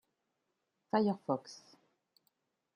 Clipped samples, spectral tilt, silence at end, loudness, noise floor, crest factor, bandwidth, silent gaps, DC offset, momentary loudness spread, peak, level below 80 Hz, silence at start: under 0.1%; -7 dB/octave; 1.15 s; -35 LUFS; -84 dBFS; 22 dB; 10.5 kHz; none; under 0.1%; 21 LU; -18 dBFS; -86 dBFS; 0.95 s